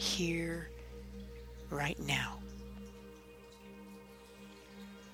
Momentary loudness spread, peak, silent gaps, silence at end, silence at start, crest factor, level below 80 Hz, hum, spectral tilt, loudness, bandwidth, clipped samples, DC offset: 20 LU; -20 dBFS; none; 0 s; 0 s; 22 dB; -54 dBFS; 60 Hz at -55 dBFS; -3.5 dB/octave; -39 LUFS; 19.5 kHz; under 0.1%; under 0.1%